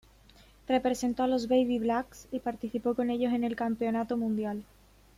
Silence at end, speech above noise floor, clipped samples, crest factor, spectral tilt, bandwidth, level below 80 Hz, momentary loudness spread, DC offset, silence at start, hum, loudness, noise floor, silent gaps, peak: 0.55 s; 28 dB; under 0.1%; 18 dB; -5.5 dB/octave; 15 kHz; -60 dBFS; 9 LU; under 0.1%; 0.7 s; none; -30 LUFS; -58 dBFS; none; -14 dBFS